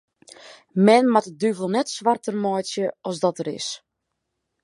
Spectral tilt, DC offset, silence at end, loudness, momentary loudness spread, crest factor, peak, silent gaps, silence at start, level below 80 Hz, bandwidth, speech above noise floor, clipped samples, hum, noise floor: -5 dB/octave; under 0.1%; 0.85 s; -22 LUFS; 13 LU; 20 dB; -2 dBFS; none; 0.45 s; -76 dBFS; 11.5 kHz; 58 dB; under 0.1%; none; -79 dBFS